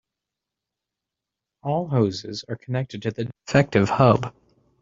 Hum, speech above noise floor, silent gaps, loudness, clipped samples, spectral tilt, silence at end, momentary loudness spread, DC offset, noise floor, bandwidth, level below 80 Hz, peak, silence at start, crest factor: none; 64 dB; none; -23 LUFS; under 0.1%; -7 dB/octave; 0.5 s; 14 LU; under 0.1%; -86 dBFS; 7.6 kHz; -54 dBFS; -2 dBFS; 1.65 s; 22 dB